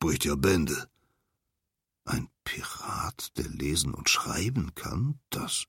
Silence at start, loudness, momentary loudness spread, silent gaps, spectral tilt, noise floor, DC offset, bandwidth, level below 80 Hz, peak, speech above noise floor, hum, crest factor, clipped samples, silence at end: 0 s; -30 LUFS; 10 LU; none; -4 dB/octave; -85 dBFS; under 0.1%; 16.5 kHz; -46 dBFS; -10 dBFS; 55 dB; none; 22 dB; under 0.1%; 0.05 s